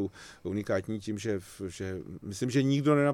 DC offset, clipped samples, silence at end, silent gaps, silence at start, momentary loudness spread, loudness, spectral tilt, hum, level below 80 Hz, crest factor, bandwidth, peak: under 0.1%; under 0.1%; 0 s; none; 0 s; 15 LU; -32 LUFS; -6.5 dB/octave; none; -62 dBFS; 18 dB; 14.5 kHz; -12 dBFS